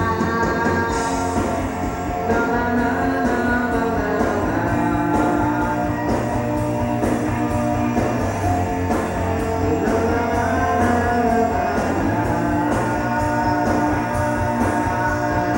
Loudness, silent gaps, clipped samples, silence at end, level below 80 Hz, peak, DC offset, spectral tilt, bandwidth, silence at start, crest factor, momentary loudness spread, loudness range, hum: -20 LUFS; none; under 0.1%; 0 s; -34 dBFS; -6 dBFS; under 0.1%; -6.5 dB/octave; 16.5 kHz; 0 s; 14 dB; 3 LU; 2 LU; none